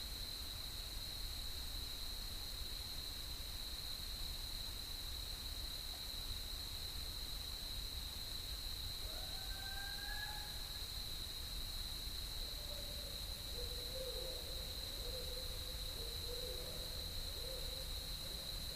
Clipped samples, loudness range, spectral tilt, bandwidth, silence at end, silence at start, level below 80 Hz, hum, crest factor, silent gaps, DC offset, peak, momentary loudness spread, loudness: under 0.1%; 1 LU; -2 dB/octave; 15.5 kHz; 0 s; 0 s; -50 dBFS; none; 14 dB; none; under 0.1%; -32 dBFS; 1 LU; -44 LUFS